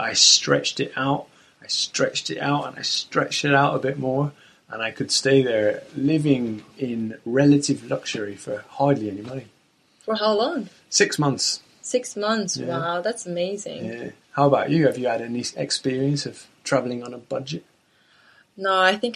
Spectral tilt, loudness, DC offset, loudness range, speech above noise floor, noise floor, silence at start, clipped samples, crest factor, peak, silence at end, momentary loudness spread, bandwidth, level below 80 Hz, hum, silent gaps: -3.5 dB/octave; -22 LUFS; under 0.1%; 4 LU; 37 dB; -60 dBFS; 0 s; under 0.1%; 20 dB; -2 dBFS; 0 s; 13 LU; 12.5 kHz; -64 dBFS; none; none